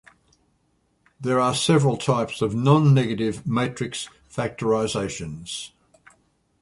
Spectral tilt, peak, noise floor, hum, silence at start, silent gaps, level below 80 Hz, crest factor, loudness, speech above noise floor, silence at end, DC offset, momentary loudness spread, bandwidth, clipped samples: -6 dB/octave; -4 dBFS; -67 dBFS; none; 1.2 s; none; -54 dBFS; 18 dB; -23 LUFS; 45 dB; 0.95 s; under 0.1%; 15 LU; 11.5 kHz; under 0.1%